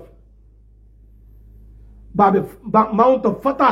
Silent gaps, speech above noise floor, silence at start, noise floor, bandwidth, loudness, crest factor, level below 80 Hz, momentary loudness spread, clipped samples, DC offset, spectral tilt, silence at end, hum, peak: none; 33 dB; 2.15 s; -48 dBFS; 13.5 kHz; -17 LUFS; 18 dB; -46 dBFS; 6 LU; under 0.1%; under 0.1%; -8.5 dB/octave; 0 s; none; -2 dBFS